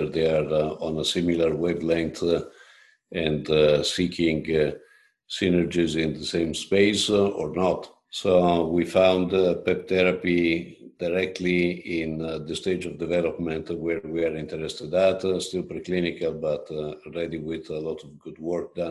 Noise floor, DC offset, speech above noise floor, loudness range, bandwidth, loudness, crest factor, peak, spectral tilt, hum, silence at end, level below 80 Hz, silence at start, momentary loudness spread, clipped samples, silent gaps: -54 dBFS; under 0.1%; 30 dB; 5 LU; 12.5 kHz; -25 LUFS; 20 dB; -6 dBFS; -5.5 dB/octave; none; 0 s; -50 dBFS; 0 s; 12 LU; under 0.1%; none